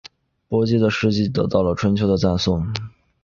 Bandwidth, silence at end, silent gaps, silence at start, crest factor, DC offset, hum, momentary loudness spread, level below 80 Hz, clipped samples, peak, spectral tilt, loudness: 7.2 kHz; 0.35 s; none; 0.05 s; 18 dB; under 0.1%; none; 8 LU; -40 dBFS; under 0.1%; -2 dBFS; -7 dB/octave; -20 LUFS